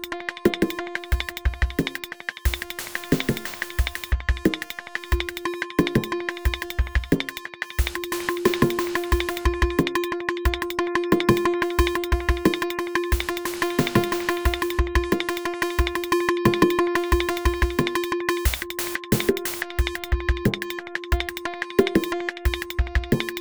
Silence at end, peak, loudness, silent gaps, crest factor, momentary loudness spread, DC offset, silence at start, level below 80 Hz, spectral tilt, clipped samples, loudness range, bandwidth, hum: 0 s; -2 dBFS; -24 LUFS; none; 22 dB; 7 LU; under 0.1%; 0 s; -30 dBFS; -5 dB/octave; under 0.1%; 4 LU; over 20 kHz; none